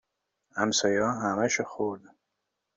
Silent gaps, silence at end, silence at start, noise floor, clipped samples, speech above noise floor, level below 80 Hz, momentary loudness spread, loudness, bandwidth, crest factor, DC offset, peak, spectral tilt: none; 0.8 s; 0.55 s; -82 dBFS; under 0.1%; 55 dB; -68 dBFS; 11 LU; -27 LUFS; 8 kHz; 20 dB; under 0.1%; -10 dBFS; -3 dB/octave